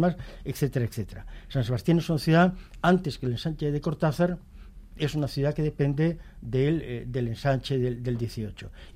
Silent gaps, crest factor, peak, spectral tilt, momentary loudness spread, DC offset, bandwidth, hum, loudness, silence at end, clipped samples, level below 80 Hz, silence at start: none; 16 dB; -10 dBFS; -7.5 dB/octave; 13 LU; under 0.1%; 15.5 kHz; none; -27 LUFS; 0.05 s; under 0.1%; -44 dBFS; 0 s